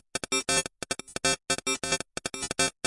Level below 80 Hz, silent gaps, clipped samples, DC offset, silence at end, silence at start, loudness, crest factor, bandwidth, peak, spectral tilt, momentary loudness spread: -56 dBFS; none; under 0.1%; under 0.1%; 0.15 s; 0.15 s; -28 LUFS; 20 dB; 11.5 kHz; -10 dBFS; -1 dB/octave; 8 LU